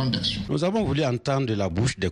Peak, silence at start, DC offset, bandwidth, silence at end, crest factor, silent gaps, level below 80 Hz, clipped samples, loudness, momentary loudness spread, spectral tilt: -8 dBFS; 0 s; under 0.1%; 11 kHz; 0 s; 16 dB; none; -44 dBFS; under 0.1%; -25 LUFS; 2 LU; -5.5 dB/octave